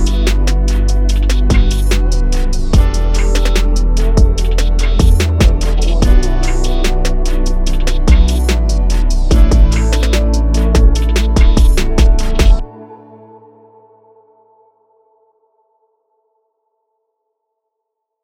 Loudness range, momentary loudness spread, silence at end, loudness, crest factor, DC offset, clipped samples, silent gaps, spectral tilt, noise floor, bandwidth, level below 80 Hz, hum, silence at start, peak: 3 LU; 6 LU; 5.3 s; -14 LUFS; 10 dB; under 0.1%; under 0.1%; none; -5.5 dB/octave; -76 dBFS; 13 kHz; -12 dBFS; none; 0 s; 0 dBFS